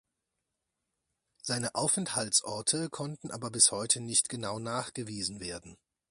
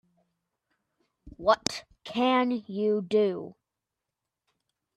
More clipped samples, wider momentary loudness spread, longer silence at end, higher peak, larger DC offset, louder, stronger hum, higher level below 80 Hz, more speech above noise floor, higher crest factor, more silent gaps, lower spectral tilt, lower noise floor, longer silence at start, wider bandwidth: neither; about the same, 15 LU vs 13 LU; second, 0.35 s vs 1.45 s; about the same, -8 dBFS vs -8 dBFS; neither; about the same, -29 LUFS vs -27 LUFS; neither; about the same, -66 dBFS vs -64 dBFS; second, 53 dB vs 60 dB; about the same, 24 dB vs 24 dB; neither; second, -2 dB/octave vs -4.5 dB/octave; about the same, -85 dBFS vs -87 dBFS; first, 1.45 s vs 1.25 s; about the same, 11.5 kHz vs 12.5 kHz